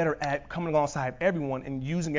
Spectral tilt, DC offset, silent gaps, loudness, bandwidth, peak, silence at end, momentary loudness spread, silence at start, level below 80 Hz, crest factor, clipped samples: -6.5 dB/octave; under 0.1%; none; -29 LUFS; 7.6 kHz; -12 dBFS; 0 s; 5 LU; 0 s; -52 dBFS; 16 dB; under 0.1%